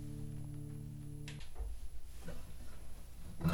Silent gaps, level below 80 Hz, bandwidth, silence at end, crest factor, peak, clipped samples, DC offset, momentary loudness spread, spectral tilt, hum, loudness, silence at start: none; -48 dBFS; 19.5 kHz; 0 s; 22 dB; -20 dBFS; under 0.1%; under 0.1%; 8 LU; -6.5 dB/octave; none; -49 LUFS; 0 s